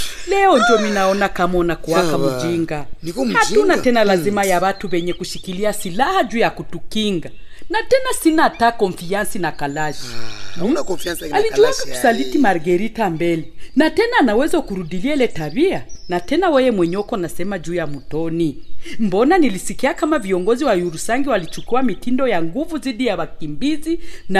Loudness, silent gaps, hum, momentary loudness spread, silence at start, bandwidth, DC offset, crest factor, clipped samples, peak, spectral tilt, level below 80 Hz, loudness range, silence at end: -18 LUFS; none; none; 10 LU; 0 s; 14 kHz; under 0.1%; 14 dB; under 0.1%; -2 dBFS; -4.5 dB/octave; -38 dBFS; 3 LU; 0 s